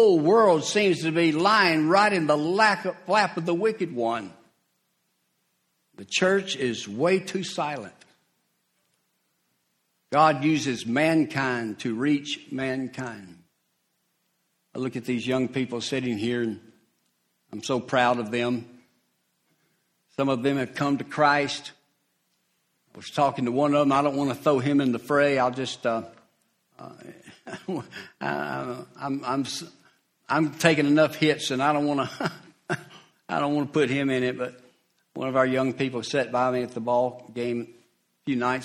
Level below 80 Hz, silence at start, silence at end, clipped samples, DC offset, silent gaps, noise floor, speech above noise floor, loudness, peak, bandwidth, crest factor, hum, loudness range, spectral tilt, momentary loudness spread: -68 dBFS; 0 s; 0 s; under 0.1%; under 0.1%; none; -74 dBFS; 49 dB; -25 LUFS; -2 dBFS; 14.5 kHz; 24 dB; none; 8 LU; -5 dB/octave; 14 LU